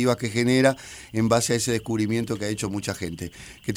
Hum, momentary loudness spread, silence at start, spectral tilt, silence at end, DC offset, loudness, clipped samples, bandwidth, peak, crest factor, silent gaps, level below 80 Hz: none; 14 LU; 0 s; -5 dB/octave; 0 s; under 0.1%; -24 LUFS; under 0.1%; 18.5 kHz; -4 dBFS; 20 dB; none; -52 dBFS